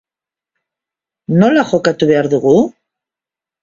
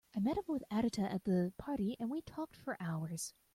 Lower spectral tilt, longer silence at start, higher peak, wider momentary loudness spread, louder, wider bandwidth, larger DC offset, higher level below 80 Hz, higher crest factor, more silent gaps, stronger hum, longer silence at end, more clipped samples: about the same, -7 dB/octave vs -6 dB/octave; first, 1.3 s vs 0.15 s; first, 0 dBFS vs -22 dBFS; about the same, 7 LU vs 8 LU; first, -13 LUFS vs -39 LUFS; second, 7.6 kHz vs 16 kHz; neither; first, -54 dBFS vs -64 dBFS; about the same, 16 dB vs 16 dB; neither; neither; first, 0.9 s vs 0.25 s; neither